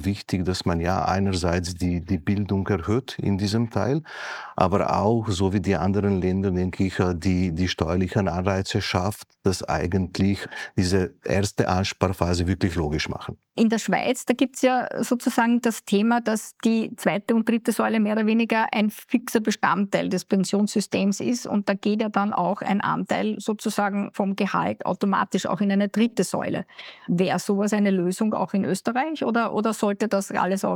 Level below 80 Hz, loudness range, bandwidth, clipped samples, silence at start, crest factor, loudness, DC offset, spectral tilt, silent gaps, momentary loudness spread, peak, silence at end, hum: -52 dBFS; 2 LU; 17.5 kHz; under 0.1%; 0 s; 22 dB; -24 LUFS; under 0.1%; -6 dB/octave; none; 5 LU; -2 dBFS; 0 s; none